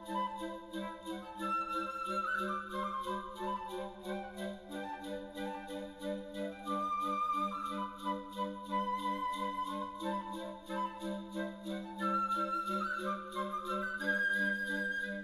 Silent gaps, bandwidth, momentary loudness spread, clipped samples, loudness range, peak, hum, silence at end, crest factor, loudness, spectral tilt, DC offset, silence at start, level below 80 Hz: none; 14 kHz; 9 LU; under 0.1%; 6 LU; -22 dBFS; none; 0 s; 16 dB; -38 LUFS; -5 dB/octave; under 0.1%; 0 s; -64 dBFS